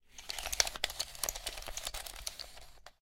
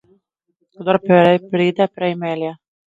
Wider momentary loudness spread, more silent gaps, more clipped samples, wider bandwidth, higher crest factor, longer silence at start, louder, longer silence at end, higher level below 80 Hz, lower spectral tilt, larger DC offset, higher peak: first, 16 LU vs 13 LU; neither; neither; first, 17 kHz vs 7.6 kHz; first, 36 dB vs 18 dB; second, 0.05 s vs 0.8 s; second, -37 LUFS vs -17 LUFS; second, 0.1 s vs 0.3 s; first, -52 dBFS vs -64 dBFS; second, 0.5 dB/octave vs -8 dB/octave; neither; second, -6 dBFS vs 0 dBFS